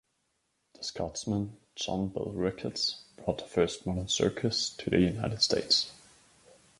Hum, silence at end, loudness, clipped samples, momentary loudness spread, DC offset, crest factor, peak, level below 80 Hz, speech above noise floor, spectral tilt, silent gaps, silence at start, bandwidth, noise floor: none; 0.85 s; -31 LUFS; under 0.1%; 11 LU; under 0.1%; 22 dB; -10 dBFS; -54 dBFS; 46 dB; -4 dB/octave; none; 0.8 s; 11.5 kHz; -77 dBFS